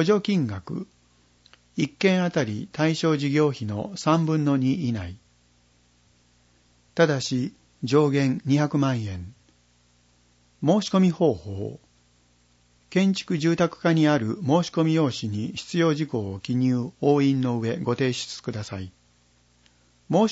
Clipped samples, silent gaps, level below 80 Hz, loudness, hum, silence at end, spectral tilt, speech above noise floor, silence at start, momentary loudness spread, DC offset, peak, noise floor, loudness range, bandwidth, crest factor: under 0.1%; none; -60 dBFS; -24 LUFS; 60 Hz at -50 dBFS; 0 s; -6.5 dB/octave; 39 dB; 0 s; 13 LU; under 0.1%; -8 dBFS; -62 dBFS; 4 LU; 8 kHz; 18 dB